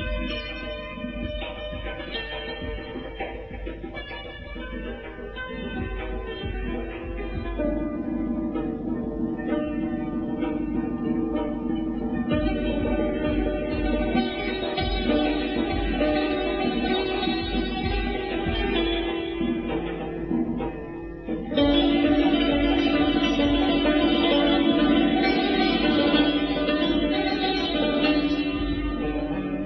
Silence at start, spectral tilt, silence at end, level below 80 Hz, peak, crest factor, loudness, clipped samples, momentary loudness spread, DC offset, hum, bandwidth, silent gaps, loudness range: 0 s; -4 dB/octave; 0 s; -36 dBFS; -8 dBFS; 16 dB; -25 LUFS; under 0.1%; 13 LU; under 0.1%; none; 6.2 kHz; none; 12 LU